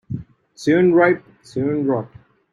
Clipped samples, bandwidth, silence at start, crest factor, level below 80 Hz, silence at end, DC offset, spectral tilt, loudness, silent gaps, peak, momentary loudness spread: under 0.1%; 10.5 kHz; 0.1 s; 16 dB; -56 dBFS; 0.45 s; under 0.1%; -7.5 dB/octave; -18 LUFS; none; -4 dBFS; 18 LU